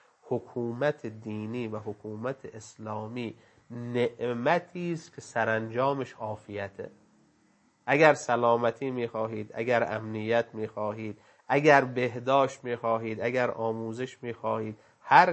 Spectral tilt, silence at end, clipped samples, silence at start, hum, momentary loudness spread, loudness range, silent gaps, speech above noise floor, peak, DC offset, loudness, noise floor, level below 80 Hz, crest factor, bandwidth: -6 dB/octave; 0 s; under 0.1%; 0.25 s; none; 17 LU; 8 LU; none; 38 dB; -4 dBFS; under 0.1%; -29 LUFS; -66 dBFS; -74 dBFS; 24 dB; 8.6 kHz